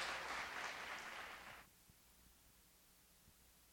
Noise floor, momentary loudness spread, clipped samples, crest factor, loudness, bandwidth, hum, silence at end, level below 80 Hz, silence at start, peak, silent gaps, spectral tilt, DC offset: -70 dBFS; 22 LU; under 0.1%; 22 dB; -48 LUFS; over 20 kHz; none; 0 s; -74 dBFS; 0 s; -32 dBFS; none; -1 dB/octave; under 0.1%